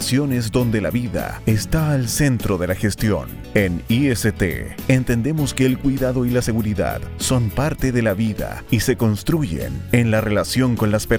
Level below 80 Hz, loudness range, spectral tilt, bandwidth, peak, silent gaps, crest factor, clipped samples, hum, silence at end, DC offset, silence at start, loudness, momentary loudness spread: -34 dBFS; 1 LU; -5.5 dB/octave; 18.5 kHz; 0 dBFS; none; 18 dB; under 0.1%; none; 0 s; under 0.1%; 0 s; -20 LUFS; 5 LU